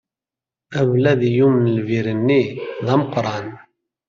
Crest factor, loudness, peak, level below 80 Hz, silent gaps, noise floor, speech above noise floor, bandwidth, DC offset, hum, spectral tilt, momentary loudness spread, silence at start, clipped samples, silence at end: 16 dB; -18 LUFS; -2 dBFS; -58 dBFS; none; -89 dBFS; 72 dB; 7.2 kHz; under 0.1%; none; -8 dB/octave; 11 LU; 0.7 s; under 0.1%; 0.5 s